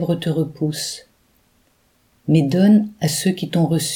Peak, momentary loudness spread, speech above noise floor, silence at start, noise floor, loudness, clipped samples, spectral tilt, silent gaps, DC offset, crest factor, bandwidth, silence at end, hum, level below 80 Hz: -4 dBFS; 12 LU; 43 dB; 0 s; -61 dBFS; -18 LUFS; under 0.1%; -5.5 dB/octave; none; under 0.1%; 16 dB; 18 kHz; 0 s; none; -60 dBFS